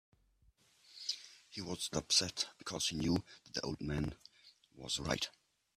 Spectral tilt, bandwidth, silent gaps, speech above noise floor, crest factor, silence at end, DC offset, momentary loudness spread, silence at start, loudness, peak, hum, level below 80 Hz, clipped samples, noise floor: -3 dB/octave; 14.5 kHz; none; 33 dB; 26 dB; 0.45 s; under 0.1%; 15 LU; 0.9 s; -38 LUFS; -16 dBFS; none; -60 dBFS; under 0.1%; -72 dBFS